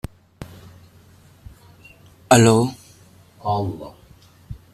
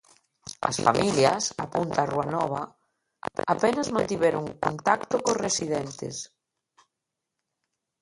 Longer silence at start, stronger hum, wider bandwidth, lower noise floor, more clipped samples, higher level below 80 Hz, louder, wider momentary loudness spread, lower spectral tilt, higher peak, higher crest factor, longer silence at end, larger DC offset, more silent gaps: about the same, 0.4 s vs 0.45 s; neither; first, 14 kHz vs 11.5 kHz; second, -50 dBFS vs -85 dBFS; neither; first, -48 dBFS vs -60 dBFS; first, -18 LUFS vs -26 LUFS; first, 28 LU vs 13 LU; about the same, -5 dB/octave vs -4 dB/octave; first, 0 dBFS vs -4 dBFS; about the same, 24 dB vs 24 dB; second, 0.2 s vs 1.75 s; neither; neither